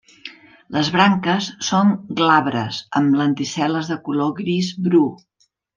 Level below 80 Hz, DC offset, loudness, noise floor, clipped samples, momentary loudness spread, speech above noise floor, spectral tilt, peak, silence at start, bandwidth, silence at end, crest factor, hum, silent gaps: -62 dBFS; under 0.1%; -19 LUFS; -41 dBFS; under 0.1%; 8 LU; 23 dB; -5 dB/octave; -2 dBFS; 0.25 s; 9.4 kHz; 0.6 s; 18 dB; none; none